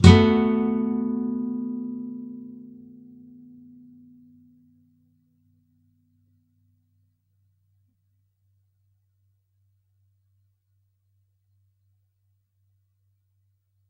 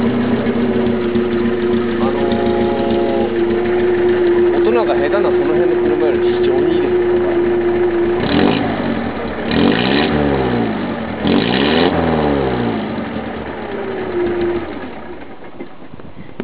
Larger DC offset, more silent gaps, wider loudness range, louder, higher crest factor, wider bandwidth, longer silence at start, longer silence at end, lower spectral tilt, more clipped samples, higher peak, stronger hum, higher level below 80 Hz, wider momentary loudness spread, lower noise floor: second, under 0.1% vs 2%; neither; first, 28 LU vs 5 LU; second, -23 LUFS vs -16 LUFS; first, 28 dB vs 16 dB; first, 10 kHz vs 4 kHz; about the same, 0 s vs 0 s; first, 11.3 s vs 0 s; second, -7 dB/octave vs -10.5 dB/octave; neither; about the same, 0 dBFS vs 0 dBFS; neither; second, -46 dBFS vs -36 dBFS; first, 30 LU vs 11 LU; first, -71 dBFS vs -36 dBFS